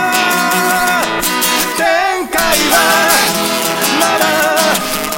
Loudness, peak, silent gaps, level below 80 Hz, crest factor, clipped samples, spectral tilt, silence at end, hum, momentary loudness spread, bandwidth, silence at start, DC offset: -11 LUFS; 0 dBFS; none; -40 dBFS; 12 dB; under 0.1%; -1.5 dB/octave; 0 s; none; 5 LU; 17 kHz; 0 s; under 0.1%